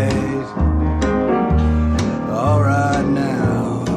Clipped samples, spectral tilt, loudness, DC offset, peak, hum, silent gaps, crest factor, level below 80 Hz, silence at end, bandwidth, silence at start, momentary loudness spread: under 0.1%; -7.5 dB/octave; -18 LUFS; under 0.1%; -4 dBFS; none; none; 12 dB; -24 dBFS; 0 s; 10 kHz; 0 s; 4 LU